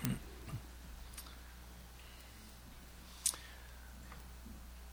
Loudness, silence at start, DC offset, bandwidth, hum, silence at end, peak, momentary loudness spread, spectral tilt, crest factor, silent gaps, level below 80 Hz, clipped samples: -47 LUFS; 0 s; under 0.1%; over 20 kHz; none; 0 s; -12 dBFS; 17 LU; -3 dB/octave; 36 dB; none; -54 dBFS; under 0.1%